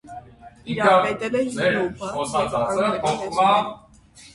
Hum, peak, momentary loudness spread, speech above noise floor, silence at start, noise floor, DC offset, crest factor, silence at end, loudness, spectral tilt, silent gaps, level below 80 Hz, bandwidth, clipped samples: none; -2 dBFS; 14 LU; 28 dB; 0.05 s; -49 dBFS; under 0.1%; 20 dB; 0.05 s; -21 LUFS; -4.5 dB/octave; none; -54 dBFS; 11.5 kHz; under 0.1%